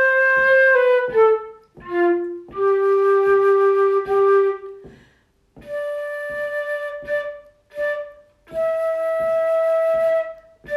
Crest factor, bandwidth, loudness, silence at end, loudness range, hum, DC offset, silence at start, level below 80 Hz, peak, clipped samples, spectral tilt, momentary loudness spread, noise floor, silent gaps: 12 dB; 12 kHz; -19 LUFS; 0 s; 10 LU; none; under 0.1%; 0 s; -58 dBFS; -6 dBFS; under 0.1%; -5.5 dB/octave; 15 LU; -59 dBFS; none